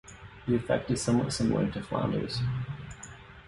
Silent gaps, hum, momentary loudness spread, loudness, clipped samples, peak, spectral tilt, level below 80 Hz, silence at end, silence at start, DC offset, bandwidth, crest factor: none; none; 16 LU; -30 LUFS; under 0.1%; -14 dBFS; -6 dB/octave; -50 dBFS; 0 s; 0.05 s; under 0.1%; 11.5 kHz; 18 dB